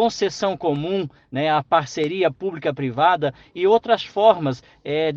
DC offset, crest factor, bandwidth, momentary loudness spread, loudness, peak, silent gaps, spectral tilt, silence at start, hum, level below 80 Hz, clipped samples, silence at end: under 0.1%; 18 dB; 7.6 kHz; 9 LU; -21 LUFS; -2 dBFS; none; -5.5 dB/octave; 0 s; none; -60 dBFS; under 0.1%; 0 s